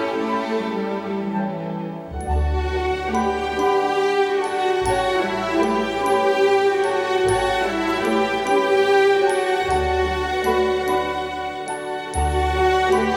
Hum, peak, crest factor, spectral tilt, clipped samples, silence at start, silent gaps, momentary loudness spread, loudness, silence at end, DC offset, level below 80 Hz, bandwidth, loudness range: none; -6 dBFS; 14 dB; -5 dB/octave; under 0.1%; 0 s; none; 9 LU; -21 LUFS; 0 s; under 0.1%; -34 dBFS; 13.5 kHz; 4 LU